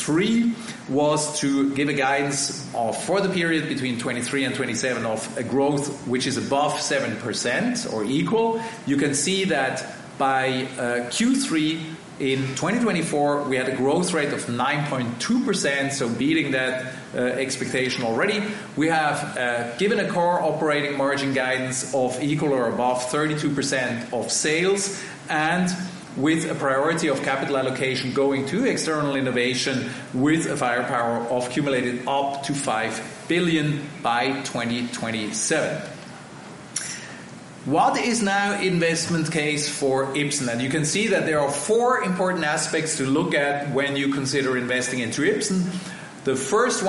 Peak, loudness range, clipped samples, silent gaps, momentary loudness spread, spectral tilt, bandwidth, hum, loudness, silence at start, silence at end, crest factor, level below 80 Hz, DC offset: -6 dBFS; 2 LU; under 0.1%; none; 6 LU; -4 dB/octave; 11.5 kHz; none; -23 LUFS; 0 s; 0 s; 16 dB; -62 dBFS; under 0.1%